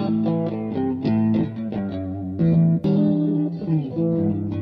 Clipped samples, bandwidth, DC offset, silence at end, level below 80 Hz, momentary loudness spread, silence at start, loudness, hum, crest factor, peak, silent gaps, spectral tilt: under 0.1%; 5.2 kHz; under 0.1%; 0 s; -52 dBFS; 9 LU; 0 s; -22 LUFS; none; 12 dB; -8 dBFS; none; -11.5 dB/octave